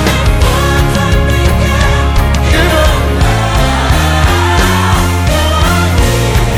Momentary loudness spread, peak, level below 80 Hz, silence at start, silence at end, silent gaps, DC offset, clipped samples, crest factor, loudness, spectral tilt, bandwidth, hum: 2 LU; 0 dBFS; -14 dBFS; 0 s; 0 s; none; under 0.1%; 0.2%; 8 dB; -10 LUFS; -5 dB/octave; 18 kHz; none